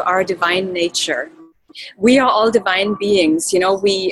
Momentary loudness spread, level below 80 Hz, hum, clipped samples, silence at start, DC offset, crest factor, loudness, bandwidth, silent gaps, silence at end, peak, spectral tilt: 9 LU; -54 dBFS; none; under 0.1%; 0 s; under 0.1%; 14 dB; -16 LUFS; 12.5 kHz; none; 0 s; -2 dBFS; -3 dB/octave